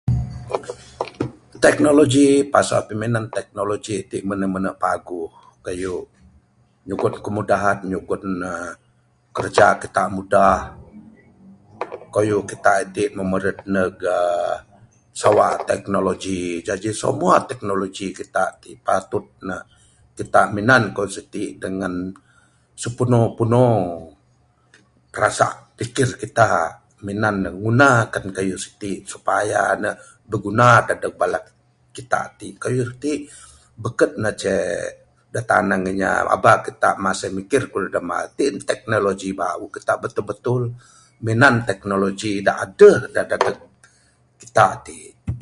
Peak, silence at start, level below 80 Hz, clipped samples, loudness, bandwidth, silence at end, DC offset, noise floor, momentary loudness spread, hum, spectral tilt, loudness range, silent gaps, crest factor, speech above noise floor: 0 dBFS; 0.05 s; -46 dBFS; under 0.1%; -20 LUFS; 11.5 kHz; 0 s; under 0.1%; -59 dBFS; 15 LU; none; -5.5 dB/octave; 6 LU; none; 20 dB; 40 dB